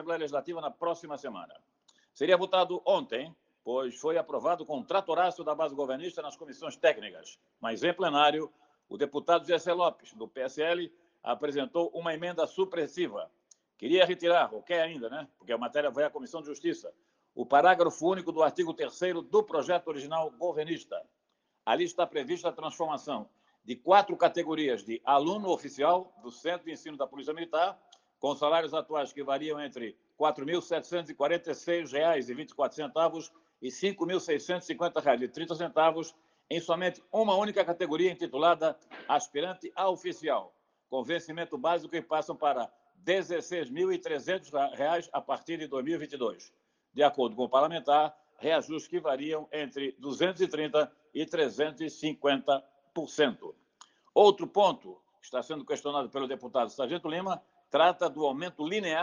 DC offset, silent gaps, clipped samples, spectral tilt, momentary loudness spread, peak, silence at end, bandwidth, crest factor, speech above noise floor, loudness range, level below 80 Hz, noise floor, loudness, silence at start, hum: under 0.1%; none; under 0.1%; -4.5 dB/octave; 13 LU; -8 dBFS; 0 s; 9.8 kHz; 22 dB; 49 dB; 4 LU; -82 dBFS; -79 dBFS; -30 LUFS; 0 s; none